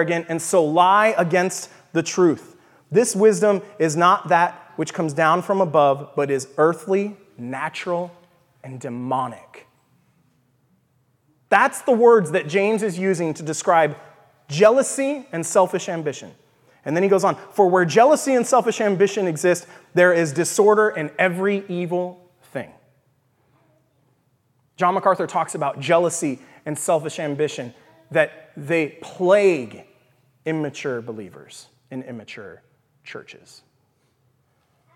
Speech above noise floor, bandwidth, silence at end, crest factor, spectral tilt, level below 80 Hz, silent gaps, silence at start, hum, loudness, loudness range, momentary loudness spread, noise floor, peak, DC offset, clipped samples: 45 dB; 15.5 kHz; 1.65 s; 20 dB; -5 dB/octave; -76 dBFS; none; 0 s; none; -20 LUFS; 13 LU; 18 LU; -65 dBFS; -2 dBFS; under 0.1%; under 0.1%